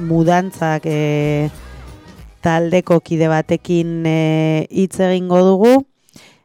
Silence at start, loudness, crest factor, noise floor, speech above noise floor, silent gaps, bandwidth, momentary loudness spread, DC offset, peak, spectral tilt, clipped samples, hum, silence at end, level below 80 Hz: 0 s; -15 LUFS; 14 dB; -46 dBFS; 32 dB; none; 14 kHz; 7 LU; under 0.1%; -2 dBFS; -7 dB/octave; under 0.1%; none; 0.6 s; -44 dBFS